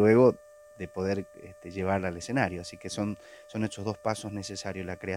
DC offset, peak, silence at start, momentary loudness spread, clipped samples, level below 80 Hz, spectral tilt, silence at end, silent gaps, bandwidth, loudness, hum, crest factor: under 0.1%; -8 dBFS; 0 s; 16 LU; under 0.1%; -62 dBFS; -6 dB/octave; 0 s; none; 16 kHz; -31 LUFS; none; 20 dB